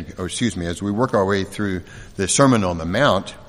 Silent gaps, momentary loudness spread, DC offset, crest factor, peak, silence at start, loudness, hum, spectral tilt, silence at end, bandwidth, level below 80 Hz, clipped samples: none; 11 LU; under 0.1%; 20 dB; 0 dBFS; 0 s; -20 LUFS; none; -4.5 dB/octave; 0.05 s; 13.5 kHz; -44 dBFS; under 0.1%